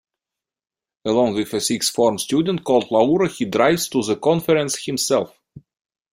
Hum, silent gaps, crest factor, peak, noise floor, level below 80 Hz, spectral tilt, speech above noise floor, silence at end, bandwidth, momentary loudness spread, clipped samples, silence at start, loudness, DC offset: none; none; 18 dB; -2 dBFS; -88 dBFS; -58 dBFS; -4 dB/octave; 69 dB; 0.55 s; 16 kHz; 4 LU; under 0.1%; 1.05 s; -19 LUFS; under 0.1%